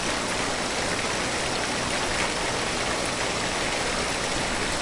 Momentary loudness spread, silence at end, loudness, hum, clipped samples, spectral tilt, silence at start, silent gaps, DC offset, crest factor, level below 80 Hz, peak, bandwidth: 1 LU; 0 s; -25 LUFS; 60 Hz at -45 dBFS; under 0.1%; -2.5 dB/octave; 0 s; none; under 0.1%; 14 dB; -42 dBFS; -12 dBFS; 11.5 kHz